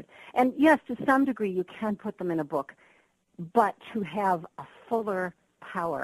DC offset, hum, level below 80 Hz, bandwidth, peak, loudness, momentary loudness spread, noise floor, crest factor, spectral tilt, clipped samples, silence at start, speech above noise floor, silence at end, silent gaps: under 0.1%; none; -68 dBFS; 13 kHz; -8 dBFS; -28 LUFS; 14 LU; -65 dBFS; 20 dB; -7 dB/octave; under 0.1%; 0.2 s; 38 dB; 0 s; none